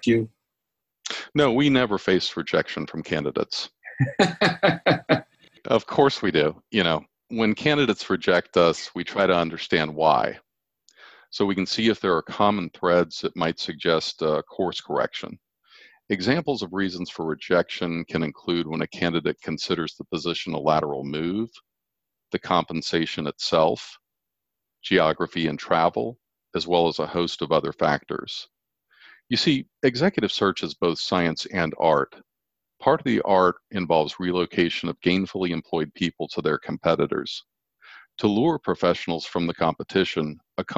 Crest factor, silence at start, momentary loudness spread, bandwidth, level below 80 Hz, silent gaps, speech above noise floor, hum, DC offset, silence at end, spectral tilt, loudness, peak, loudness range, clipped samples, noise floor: 20 dB; 0 s; 10 LU; 9.4 kHz; -56 dBFS; none; 61 dB; none; under 0.1%; 0 s; -5.5 dB/octave; -24 LUFS; -4 dBFS; 4 LU; under 0.1%; -84 dBFS